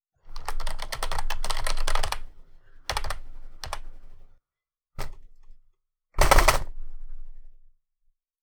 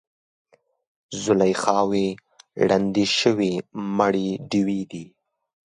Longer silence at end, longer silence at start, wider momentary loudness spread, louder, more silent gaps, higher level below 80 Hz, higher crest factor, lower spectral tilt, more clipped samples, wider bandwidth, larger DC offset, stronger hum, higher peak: first, 0.9 s vs 0.7 s; second, 0.25 s vs 1.1 s; first, 26 LU vs 15 LU; second, -28 LUFS vs -22 LUFS; neither; first, -30 dBFS vs -60 dBFS; first, 26 dB vs 20 dB; second, -2.5 dB/octave vs -5 dB/octave; neither; first, over 20 kHz vs 11 kHz; neither; neither; about the same, -2 dBFS vs -4 dBFS